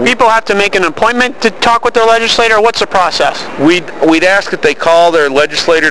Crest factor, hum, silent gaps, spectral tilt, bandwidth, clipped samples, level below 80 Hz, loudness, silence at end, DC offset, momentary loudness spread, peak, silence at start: 10 dB; none; none; -3 dB/octave; 11 kHz; under 0.1%; -42 dBFS; -9 LUFS; 0 s; 5%; 4 LU; 0 dBFS; 0 s